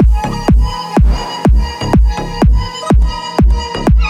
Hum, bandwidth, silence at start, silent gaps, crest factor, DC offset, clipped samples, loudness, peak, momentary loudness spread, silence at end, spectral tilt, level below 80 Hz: none; 9.6 kHz; 0 s; none; 10 dB; under 0.1%; under 0.1%; -14 LUFS; 0 dBFS; 2 LU; 0 s; -6.5 dB/octave; -12 dBFS